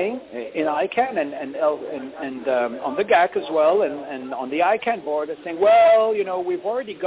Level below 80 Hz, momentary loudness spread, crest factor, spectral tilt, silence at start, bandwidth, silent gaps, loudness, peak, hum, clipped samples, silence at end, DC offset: -66 dBFS; 14 LU; 14 dB; -8 dB/octave; 0 s; 4 kHz; none; -21 LUFS; -8 dBFS; none; under 0.1%; 0 s; under 0.1%